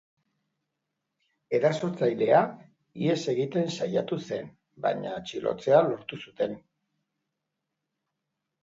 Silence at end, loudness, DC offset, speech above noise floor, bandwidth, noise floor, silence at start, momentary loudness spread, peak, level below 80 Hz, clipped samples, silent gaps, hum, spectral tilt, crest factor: 2.05 s; -27 LUFS; under 0.1%; 57 dB; 8 kHz; -84 dBFS; 1.5 s; 13 LU; -8 dBFS; -72 dBFS; under 0.1%; none; none; -6 dB/octave; 22 dB